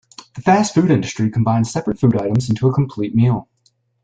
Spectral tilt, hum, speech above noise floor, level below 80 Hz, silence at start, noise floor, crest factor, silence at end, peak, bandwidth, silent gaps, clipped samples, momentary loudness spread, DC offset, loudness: -7 dB/octave; none; 46 dB; -48 dBFS; 0.35 s; -62 dBFS; 16 dB; 0.6 s; -2 dBFS; 9.2 kHz; none; under 0.1%; 6 LU; under 0.1%; -17 LUFS